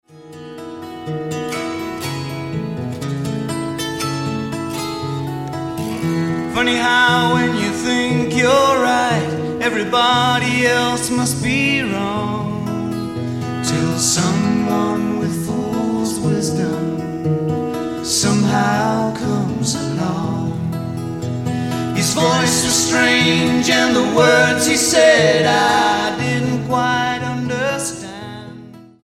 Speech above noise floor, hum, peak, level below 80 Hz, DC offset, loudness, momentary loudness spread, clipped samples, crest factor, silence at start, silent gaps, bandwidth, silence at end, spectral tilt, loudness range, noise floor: 23 dB; none; -2 dBFS; -48 dBFS; 0.2%; -17 LUFS; 11 LU; under 0.1%; 16 dB; 0.1 s; none; 16.5 kHz; 0.2 s; -4 dB/octave; 10 LU; -38 dBFS